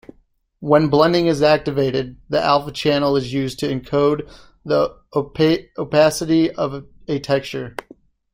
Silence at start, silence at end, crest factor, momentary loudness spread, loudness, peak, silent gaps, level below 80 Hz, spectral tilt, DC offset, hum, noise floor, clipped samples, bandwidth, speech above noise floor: 0.6 s; 0.6 s; 18 dB; 12 LU; -19 LUFS; 0 dBFS; none; -48 dBFS; -6 dB/octave; under 0.1%; none; -58 dBFS; under 0.1%; 16 kHz; 40 dB